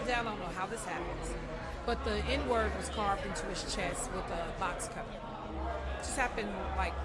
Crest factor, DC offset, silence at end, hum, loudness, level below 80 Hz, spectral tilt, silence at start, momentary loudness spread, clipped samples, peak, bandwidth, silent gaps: 18 dB; under 0.1%; 0 s; none; -36 LUFS; -44 dBFS; -4 dB/octave; 0 s; 8 LU; under 0.1%; -16 dBFS; 12 kHz; none